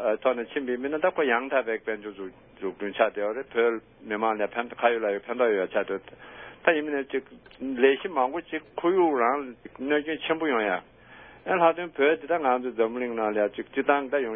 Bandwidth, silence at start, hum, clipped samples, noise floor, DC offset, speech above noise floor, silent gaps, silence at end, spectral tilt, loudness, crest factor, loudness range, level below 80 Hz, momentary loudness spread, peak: 3.7 kHz; 0 s; none; under 0.1%; -50 dBFS; under 0.1%; 23 dB; none; 0 s; -9 dB/octave; -26 LUFS; 22 dB; 2 LU; -66 dBFS; 12 LU; -4 dBFS